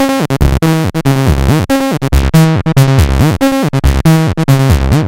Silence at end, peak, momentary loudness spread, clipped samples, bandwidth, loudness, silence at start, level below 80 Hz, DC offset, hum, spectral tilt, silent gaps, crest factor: 0 s; 0 dBFS; 3 LU; 0.3%; 16.5 kHz; -10 LUFS; 0 s; -16 dBFS; under 0.1%; none; -6.5 dB/octave; none; 10 dB